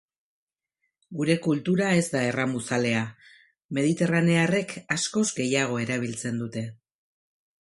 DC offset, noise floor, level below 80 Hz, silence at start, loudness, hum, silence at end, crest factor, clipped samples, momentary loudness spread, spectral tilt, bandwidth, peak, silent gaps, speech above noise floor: under 0.1%; -79 dBFS; -66 dBFS; 1.1 s; -25 LUFS; none; 0.9 s; 18 dB; under 0.1%; 10 LU; -5 dB/octave; 11.5 kHz; -8 dBFS; 3.64-3.69 s; 54 dB